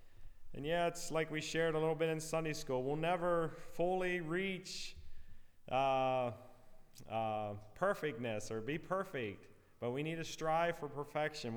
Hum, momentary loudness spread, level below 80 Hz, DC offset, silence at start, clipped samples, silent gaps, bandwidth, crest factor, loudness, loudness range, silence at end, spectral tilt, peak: none; 9 LU; -58 dBFS; under 0.1%; 0 s; under 0.1%; none; over 20 kHz; 18 dB; -39 LUFS; 4 LU; 0 s; -5 dB/octave; -22 dBFS